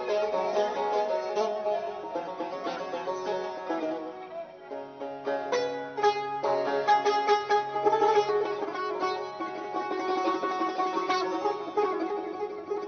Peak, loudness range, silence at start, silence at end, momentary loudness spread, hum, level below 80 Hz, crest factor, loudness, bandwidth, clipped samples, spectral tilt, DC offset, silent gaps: -12 dBFS; 7 LU; 0 s; 0 s; 11 LU; none; -76 dBFS; 18 dB; -29 LUFS; 6.6 kHz; under 0.1%; -1.5 dB/octave; under 0.1%; none